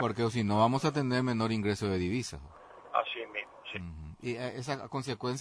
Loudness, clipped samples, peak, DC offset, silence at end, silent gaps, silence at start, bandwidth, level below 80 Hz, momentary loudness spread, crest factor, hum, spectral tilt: -33 LUFS; under 0.1%; -14 dBFS; under 0.1%; 0 s; none; 0 s; 11 kHz; -58 dBFS; 14 LU; 18 dB; none; -6 dB/octave